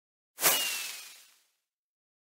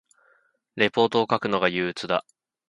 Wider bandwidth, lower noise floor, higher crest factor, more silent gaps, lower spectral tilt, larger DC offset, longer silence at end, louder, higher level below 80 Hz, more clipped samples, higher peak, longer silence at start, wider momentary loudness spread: first, 16.5 kHz vs 11 kHz; first, -80 dBFS vs -65 dBFS; about the same, 24 dB vs 20 dB; neither; second, 1 dB/octave vs -5.5 dB/octave; neither; first, 1.2 s vs 0.5 s; second, -28 LUFS vs -24 LUFS; second, -88 dBFS vs -64 dBFS; neither; second, -10 dBFS vs -4 dBFS; second, 0.4 s vs 0.75 s; first, 19 LU vs 7 LU